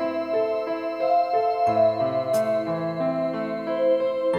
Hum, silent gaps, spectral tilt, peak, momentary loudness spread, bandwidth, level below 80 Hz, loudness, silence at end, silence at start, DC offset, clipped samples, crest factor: none; none; -6.5 dB/octave; -10 dBFS; 6 LU; 14.5 kHz; -66 dBFS; -24 LUFS; 0 s; 0 s; under 0.1%; under 0.1%; 14 dB